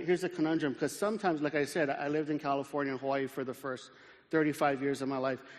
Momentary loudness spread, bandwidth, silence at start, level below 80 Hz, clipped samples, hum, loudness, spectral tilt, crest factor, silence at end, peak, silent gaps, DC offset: 7 LU; 13.5 kHz; 0 s; -74 dBFS; under 0.1%; none; -33 LUFS; -5.5 dB/octave; 16 dB; 0 s; -16 dBFS; none; under 0.1%